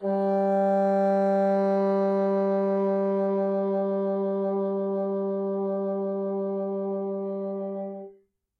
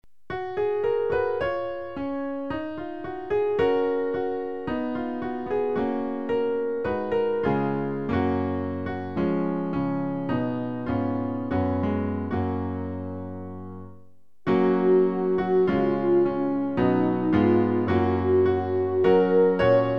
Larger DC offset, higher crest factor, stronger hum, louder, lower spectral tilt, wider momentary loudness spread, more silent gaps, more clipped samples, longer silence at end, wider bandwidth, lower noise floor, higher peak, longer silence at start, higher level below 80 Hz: second, under 0.1% vs 0.6%; second, 10 dB vs 16 dB; neither; about the same, -26 LUFS vs -25 LUFS; about the same, -10 dB/octave vs -9.5 dB/octave; second, 8 LU vs 11 LU; neither; neither; first, 0.5 s vs 0 s; about the same, 5.8 kHz vs 5.8 kHz; about the same, -58 dBFS vs -57 dBFS; second, -16 dBFS vs -8 dBFS; second, 0 s vs 0.3 s; second, -84 dBFS vs -52 dBFS